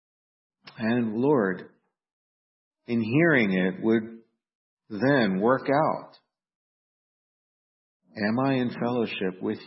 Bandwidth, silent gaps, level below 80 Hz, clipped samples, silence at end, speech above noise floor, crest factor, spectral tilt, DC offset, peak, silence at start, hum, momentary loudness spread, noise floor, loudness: 5.8 kHz; 2.13-2.71 s, 4.55-4.77 s, 6.55-8.00 s; -70 dBFS; under 0.1%; 0 s; over 66 dB; 20 dB; -11 dB/octave; under 0.1%; -8 dBFS; 0.65 s; none; 10 LU; under -90 dBFS; -25 LUFS